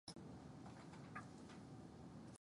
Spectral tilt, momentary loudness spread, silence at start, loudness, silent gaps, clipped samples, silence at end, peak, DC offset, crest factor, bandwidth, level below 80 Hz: -5.5 dB/octave; 3 LU; 0.05 s; -57 LUFS; none; under 0.1%; 0.05 s; -38 dBFS; under 0.1%; 18 dB; 11.5 kHz; -74 dBFS